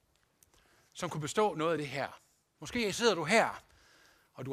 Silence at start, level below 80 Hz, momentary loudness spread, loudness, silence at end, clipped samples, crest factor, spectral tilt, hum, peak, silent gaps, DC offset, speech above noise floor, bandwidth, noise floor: 0.95 s; -68 dBFS; 19 LU; -32 LUFS; 0 s; under 0.1%; 24 dB; -4 dB/octave; none; -12 dBFS; none; under 0.1%; 38 dB; 15.5 kHz; -70 dBFS